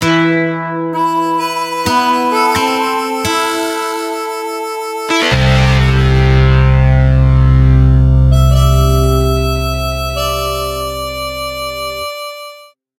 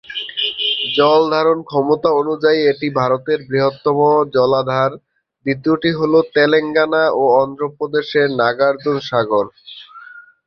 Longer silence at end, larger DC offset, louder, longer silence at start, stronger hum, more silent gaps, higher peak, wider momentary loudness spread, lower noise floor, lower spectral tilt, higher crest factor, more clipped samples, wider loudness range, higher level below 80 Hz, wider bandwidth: about the same, 0.35 s vs 0.25 s; neither; first, -13 LUFS vs -16 LUFS; about the same, 0 s vs 0.1 s; neither; neither; about the same, 0 dBFS vs -2 dBFS; first, 10 LU vs 7 LU; about the same, -38 dBFS vs -39 dBFS; about the same, -6 dB/octave vs -7 dB/octave; about the same, 12 dB vs 14 dB; neither; first, 6 LU vs 2 LU; first, -18 dBFS vs -58 dBFS; first, 16 kHz vs 6.4 kHz